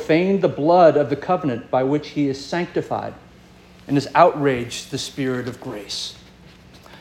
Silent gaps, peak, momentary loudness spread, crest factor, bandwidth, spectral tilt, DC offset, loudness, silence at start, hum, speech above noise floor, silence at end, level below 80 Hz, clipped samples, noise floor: none; -2 dBFS; 13 LU; 20 dB; 16 kHz; -5.5 dB/octave; under 0.1%; -20 LUFS; 0 s; none; 27 dB; 0.05 s; -54 dBFS; under 0.1%; -47 dBFS